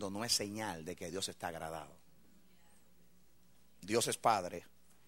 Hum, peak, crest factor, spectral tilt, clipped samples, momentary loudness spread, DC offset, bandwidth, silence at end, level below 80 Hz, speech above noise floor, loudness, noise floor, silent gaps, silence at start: none; -16 dBFS; 24 dB; -2.5 dB/octave; under 0.1%; 16 LU; under 0.1%; 16 kHz; 0.45 s; -72 dBFS; 32 dB; -37 LUFS; -70 dBFS; none; 0 s